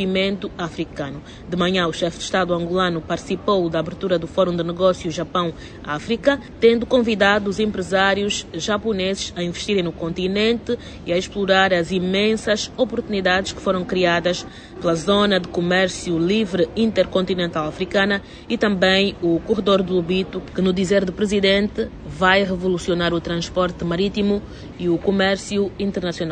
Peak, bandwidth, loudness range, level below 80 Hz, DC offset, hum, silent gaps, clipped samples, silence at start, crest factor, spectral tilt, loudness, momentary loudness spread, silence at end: 0 dBFS; 9.6 kHz; 3 LU; -44 dBFS; under 0.1%; none; none; under 0.1%; 0 s; 20 dB; -5 dB/octave; -20 LUFS; 9 LU; 0 s